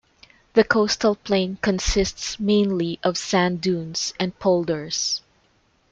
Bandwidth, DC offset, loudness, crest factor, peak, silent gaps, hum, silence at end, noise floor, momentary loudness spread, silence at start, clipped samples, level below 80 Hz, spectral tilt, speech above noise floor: 9 kHz; under 0.1%; -22 LUFS; 20 dB; -2 dBFS; none; none; 0.75 s; -62 dBFS; 6 LU; 0.55 s; under 0.1%; -40 dBFS; -4 dB/octave; 41 dB